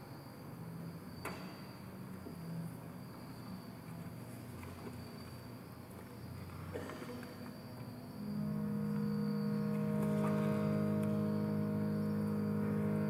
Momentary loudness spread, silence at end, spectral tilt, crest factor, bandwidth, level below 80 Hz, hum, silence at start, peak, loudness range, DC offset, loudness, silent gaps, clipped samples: 15 LU; 0 s; -8 dB/octave; 16 dB; 16 kHz; -70 dBFS; none; 0 s; -24 dBFS; 13 LU; under 0.1%; -40 LUFS; none; under 0.1%